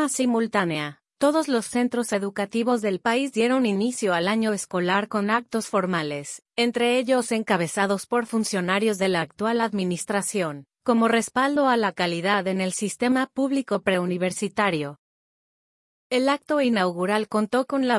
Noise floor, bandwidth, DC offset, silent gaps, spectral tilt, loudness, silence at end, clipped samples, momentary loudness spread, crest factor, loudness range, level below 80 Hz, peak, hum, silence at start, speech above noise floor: under -90 dBFS; 12 kHz; under 0.1%; 14.99-16.10 s; -4.5 dB/octave; -24 LUFS; 0 s; under 0.1%; 5 LU; 16 dB; 2 LU; -70 dBFS; -6 dBFS; none; 0 s; over 67 dB